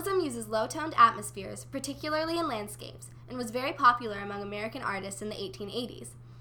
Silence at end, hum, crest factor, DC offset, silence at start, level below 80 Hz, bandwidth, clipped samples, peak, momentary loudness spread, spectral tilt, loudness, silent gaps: 0 s; none; 24 dB; under 0.1%; 0 s; -58 dBFS; 19.5 kHz; under 0.1%; -8 dBFS; 18 LU; -4 dB/octave; -30 LUFS; none